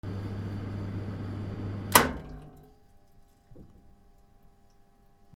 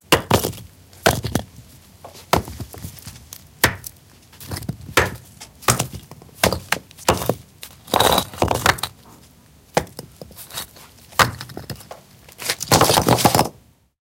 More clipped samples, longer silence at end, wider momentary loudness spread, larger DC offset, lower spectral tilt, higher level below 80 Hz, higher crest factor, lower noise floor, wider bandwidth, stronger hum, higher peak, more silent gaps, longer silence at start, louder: neither; second, 0 s vs 0.5 s; about the same, 22 LU vs 23 LU; neither; about the same, -3.5 dB/octave vs -3.5 dB/octave; second, -50 dBFS vs -40 dBFS; first, 32 dB vs 22 dB; first, -59 dBFS vs -50 dBFS; about the same, 17 kHz vs 17.5 kHz; neither; about the same, 0 dBFS vs 0 dBFS; neither; about the same, 0.05 s vs 0.1 s; second, -29 LUFS vs -20 LUFS